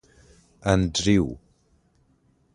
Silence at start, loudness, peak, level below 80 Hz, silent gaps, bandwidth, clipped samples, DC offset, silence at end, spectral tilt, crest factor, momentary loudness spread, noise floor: 0.65 s; -23 LUFS; -4 dBFS; -42 dBFS; none; 10.5 kHz; under 0.1%; under 0.1%; 1.2 s; -5 dB/octave; 22 dB; 11 LU; -64 dBFS